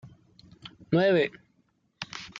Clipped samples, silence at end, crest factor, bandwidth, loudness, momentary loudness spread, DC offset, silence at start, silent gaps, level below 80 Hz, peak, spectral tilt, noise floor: under 0.1%; 0 s; 18 dB; 7.6 kHz; -26 LUFS; 25 LU; under 0.1%; 0.05 s; none; -66 dBFS; -12 dBFS; -6.5 dB/octave; -70 dBFS